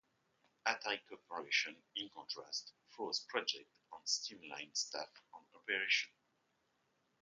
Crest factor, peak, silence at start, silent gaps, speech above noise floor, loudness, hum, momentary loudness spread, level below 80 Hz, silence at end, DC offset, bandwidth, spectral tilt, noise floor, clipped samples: 26 dB; -16 dBFS; 0.65 s; none; 38 dB; -40 LUFS; none; 13 LU; under -90 dBFS; 1.15 s; under 0.1%; 9.4 kHz; 0.5 dB/octave; -81 dBFS; under 0.1%